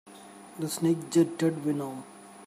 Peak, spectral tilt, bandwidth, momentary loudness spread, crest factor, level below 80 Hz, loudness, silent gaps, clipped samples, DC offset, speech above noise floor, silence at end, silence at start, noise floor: -12 dBFS; -6 dB/octave; 15.5 kHz; 22 LU; 18 dB; -76 dBFS; -28 LUFS; none; under 0.1%; under 0.1%; 21 dB; 0 s; 0.05 s; -48 dBFS